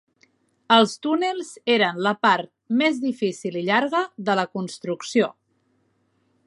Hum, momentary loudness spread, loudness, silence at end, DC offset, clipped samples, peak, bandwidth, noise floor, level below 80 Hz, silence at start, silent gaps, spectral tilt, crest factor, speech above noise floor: none; 10 LU; -22 LUFS; 1.15 s; under 0.1%; under 0.1%; -2 dBFS; 11.5 kHz; -67 dBFS; -76 dBFS; 0.7 s; none; -4.5 dB/octave; 22 dB; 46 dB